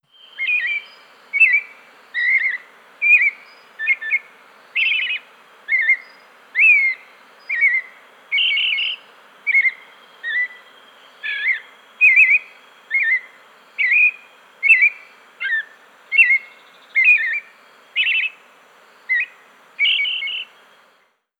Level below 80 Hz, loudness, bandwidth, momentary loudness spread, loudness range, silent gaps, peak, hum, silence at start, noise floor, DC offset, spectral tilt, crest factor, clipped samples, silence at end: under -90 dBFS; -16 LUFS; 12 kHz; 14 LU; 5 LU; none; -4 dBFS; none; 0.35 s; -60 dBFS; under 0.1%; 2 dB/octave; 18 dB; under 0.1%; 0.95 s